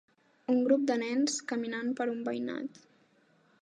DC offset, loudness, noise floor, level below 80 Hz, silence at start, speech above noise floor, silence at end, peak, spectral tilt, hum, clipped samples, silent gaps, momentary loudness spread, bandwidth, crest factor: under 0.1%; -31 LUFS; -67 dBFS; -88 dBFS; 0.5 s; 36 dB; 0.95 s; -14 dBFS; -3.5 dB/octave; none; under 0.1%; none; 12 LU; 10 kHz; 18 dB